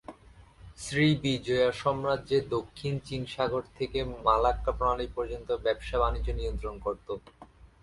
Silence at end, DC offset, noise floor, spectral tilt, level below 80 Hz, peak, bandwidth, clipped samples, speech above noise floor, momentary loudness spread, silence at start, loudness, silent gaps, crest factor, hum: 0.15 s; under 0.1%; -54 dBFS; -6 dB/octave; -42 dBFS; -10 dBFS; 11.5 kHz; under 0.1%; 25 dB; 10 LU; 0.1 s; -30 LUFS; none; 20 dB; none